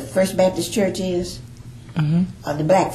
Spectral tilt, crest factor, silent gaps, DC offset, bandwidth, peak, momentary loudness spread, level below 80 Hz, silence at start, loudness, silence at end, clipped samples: -6 dB/octave; 16 dB; none; under 0.1%; 14 kHz; -4 dBFS; 16 LU; -46 dBFS; 0 s; -21 LUFS; 0 s; under 0.1%